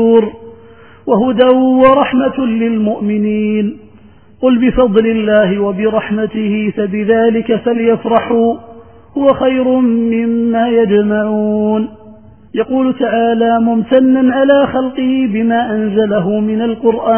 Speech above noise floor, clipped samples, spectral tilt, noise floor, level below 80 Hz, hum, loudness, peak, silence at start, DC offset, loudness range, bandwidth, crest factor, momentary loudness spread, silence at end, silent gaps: 31 dB; under 0.1%; -11 dB/octave; -42 dBFS; -42 dBFS; none; -12 LUFS; 0 dBFS; 0 s; 0.4%; 2 LU; 3.3 kHz; 12 dB; 6 LU; 0 s; none